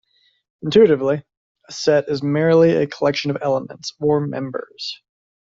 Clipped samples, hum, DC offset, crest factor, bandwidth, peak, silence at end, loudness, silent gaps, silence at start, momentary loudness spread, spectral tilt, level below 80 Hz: under 0.1%; none; under 0.1%; 16 dB; 7.6 kHz; -2 dBFS; 0.45 s; -18 LUFS; 1.37-1.55 s; 0.65 s; 16 LU; -6 dB/octave; -58 dBFS